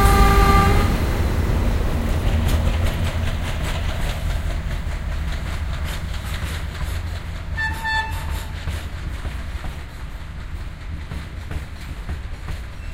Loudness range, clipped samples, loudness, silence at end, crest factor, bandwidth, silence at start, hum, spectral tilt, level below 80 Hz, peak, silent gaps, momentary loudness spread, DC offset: 11 LU; under 0.1%; -24 LUFS; 0 s; 20 dB; 16 kHz; 0 s; none; -5.5 dB/octave; -24 dBFS; -2 dBFS; none; 15 LU; under 0.1%